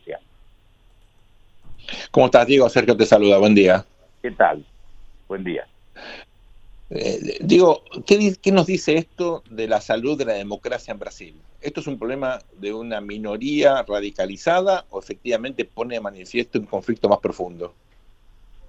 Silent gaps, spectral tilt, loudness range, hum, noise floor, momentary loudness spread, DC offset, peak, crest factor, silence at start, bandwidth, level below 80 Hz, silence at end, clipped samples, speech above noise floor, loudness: none; -5.5 dB/octave; 10 LU; none; -53 dBFS; 19 LU; under 0.1%; 0 dBFS; 20 dB; 0.05 s; 8.2 kHz; -50 dBFS; 1 s; under 0.1%; 34 dB; -20 LUFS